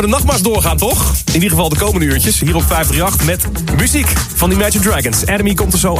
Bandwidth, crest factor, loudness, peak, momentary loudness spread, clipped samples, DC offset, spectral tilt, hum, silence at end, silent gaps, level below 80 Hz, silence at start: 16 kHz; 12 dB; -12 LUFS; 0 dBFS; 2 LU; under 0.1%; under 0.1%; -4 dB/octave; none; 0 s; none; -20 dBFS; 0 s